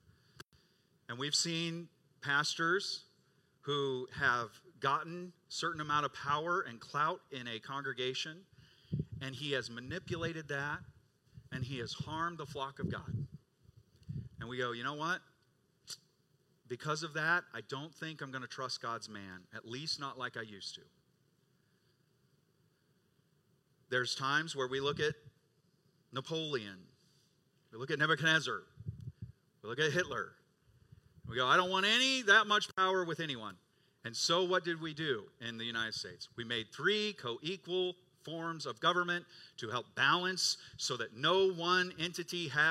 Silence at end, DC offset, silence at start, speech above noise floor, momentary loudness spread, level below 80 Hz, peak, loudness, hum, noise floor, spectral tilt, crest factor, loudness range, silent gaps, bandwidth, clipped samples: 0 s; under 0.1%; 0.4 s; 38 dB; 17 LU; -72 dBFS; -12 dBFS; -35 LUFS; none; -74 dBFS; -3 dB/octave; 26 dB; 11 LU; none; 15 kHz; under 0.1%